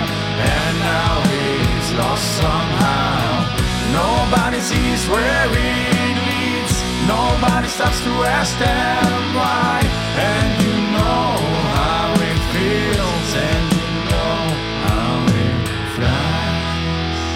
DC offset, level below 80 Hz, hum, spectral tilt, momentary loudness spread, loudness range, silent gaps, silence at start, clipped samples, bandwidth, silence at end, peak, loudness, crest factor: under 0.1%; -28 dBFS; none; -5 dB/octave; 3 LU; 1 LU; none; 0 s; under 0.1%; 17 kHz; 0 s; -2 dBFS; -17 LUFS; 16 dB